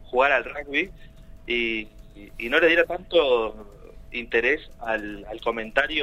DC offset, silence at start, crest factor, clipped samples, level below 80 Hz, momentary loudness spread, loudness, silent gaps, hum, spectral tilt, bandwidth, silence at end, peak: under 0.1%; 0 s; 20 dB; under 0.1%; -46 dBFS; 14 LU; -24 LUFS; none; none; -4.5 dB/octave; 13 kHz; 0 s; -4 dBFS